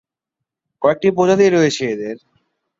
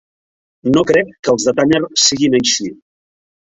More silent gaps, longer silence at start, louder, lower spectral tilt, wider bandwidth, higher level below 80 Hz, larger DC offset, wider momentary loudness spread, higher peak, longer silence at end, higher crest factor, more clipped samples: second, none vs 1.19-1.23 s; first, 0.8 s vs 0.65 s; about the same, -16 LUFS vs -14 LUFS; first, -5.5 dB/octave vs -3 dB/octave; about the same, 7.8 kHz vs 8.4 kHz; second, -60 dBFS vs -50 dBFS; neither; first, 14 LU vs 7 LU; about the same, -2 dBFS vs 0 dBFS; second, 0.65 s vs 0.85 s; about the same, 16 dB vs 16 dB; neither